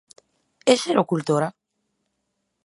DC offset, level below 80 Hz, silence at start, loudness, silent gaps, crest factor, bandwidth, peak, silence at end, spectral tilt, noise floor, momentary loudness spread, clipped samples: under 0.1%; -76 dBFS; 0.65 s; -22 LUFS; none; 22 dB; 11.5 kHz; -2 dBFS; 1.15 s; -5 dB/octave; -76 dBFS; 6 LU; under 0.1%